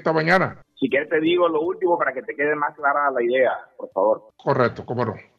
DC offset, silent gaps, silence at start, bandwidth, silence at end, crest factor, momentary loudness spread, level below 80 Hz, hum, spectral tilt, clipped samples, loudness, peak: under 0.1%; none; 0 s; 7.4 kHz; 0.2 s; 16 dB; 7 LU; -64 dBFS; none; -7.5 dB/octave; under 0.1%; -21 LUFS; -4 dBFS